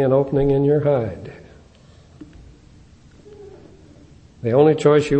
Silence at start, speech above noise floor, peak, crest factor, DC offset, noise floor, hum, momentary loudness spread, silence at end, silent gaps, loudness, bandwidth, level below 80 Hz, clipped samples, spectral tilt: 0 s; 31 dB; -2 dBFS; 18 dB; under 0.1%; -48 dBFS; none; 16 LU; 0 s; none; -18 LUFS; 8.6 kHz; -44 dBFS; under 0.1%; -8 dB/octave